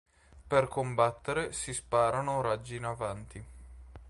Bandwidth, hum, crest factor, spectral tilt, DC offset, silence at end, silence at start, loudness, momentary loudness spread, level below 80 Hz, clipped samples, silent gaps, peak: 11.5 kHz; none; 22 dB; -4.5 dB/octave; under 0.1%; 0 s; 0.35 s; -31 LUFS; 18 LU; -54 dBFS; under 0.1%; none; -12 dBFS